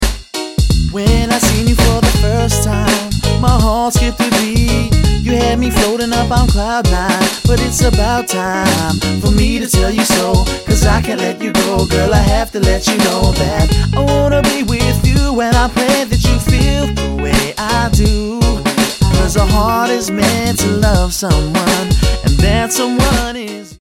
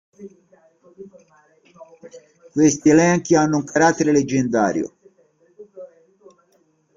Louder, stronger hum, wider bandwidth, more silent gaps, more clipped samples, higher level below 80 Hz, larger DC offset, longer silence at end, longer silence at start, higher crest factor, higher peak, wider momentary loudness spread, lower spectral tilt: first, -13 LUFS vs -17 LUFS; neither; first, 16.5 kHz vs 7.6 kHz; neither; neither; first, -18 dBFS vs -58 dBFS; neither; second, 0.05 s vs 1.1 s; second, 0 s vs 0.2 s; second, 12 dB vs 18 dB; first, 0 dBFS vs -4 dBFS; second, 3 LU vs 15 LU; about the same, -5 dB/octave vs -5.5 dB/octave